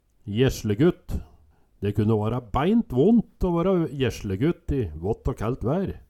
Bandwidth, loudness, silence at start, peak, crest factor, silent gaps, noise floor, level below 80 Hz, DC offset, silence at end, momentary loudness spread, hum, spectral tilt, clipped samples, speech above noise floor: 14 kHz; -24 LUFS; 0.25 s; -8 dBFS; 16 dB; none; -56 dBFS; -38 dBFS; under 0.1%; 0.1 s; 8 LU; none; -7.5 dB/octave; under 0.1%; 33 dB